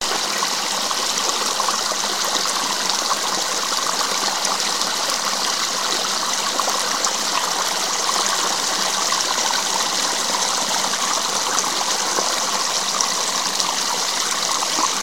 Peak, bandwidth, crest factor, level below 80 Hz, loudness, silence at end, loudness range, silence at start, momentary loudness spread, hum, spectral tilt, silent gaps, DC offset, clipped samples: 0 dBFS; 16.5 kHz; 20 dB; -64 dBFS; -19 LUFS; 0 s; 1 LU; 0 s; 1 LU; none; 0.5 dB/octave; none; 0.7%; under 0.1%